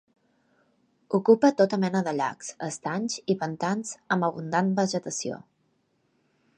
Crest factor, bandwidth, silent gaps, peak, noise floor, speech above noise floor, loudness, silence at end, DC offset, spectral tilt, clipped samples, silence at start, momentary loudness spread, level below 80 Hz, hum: 22 dB; 11 kHz; none; -6 dBFS; -71 dBFS; 45 dB; -26 LUFS; 1.2 s; under 0.1%; -5.5 dB/octave; under 0.1%; 1.1 s; 12 LU; -74 dBFS; none